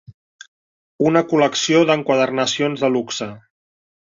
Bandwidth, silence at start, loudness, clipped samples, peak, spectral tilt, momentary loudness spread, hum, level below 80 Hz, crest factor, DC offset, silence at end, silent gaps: 7.6 kHz; 0.1 s; -18 LUFS; under 0.1%; -2 dBFS; -4.5 dB/octave; 9 LU; none; -64 dBFS; 18 dB; under 0.1%; 0.8 s; 0.14-0.39 s, 0.48-0.99 s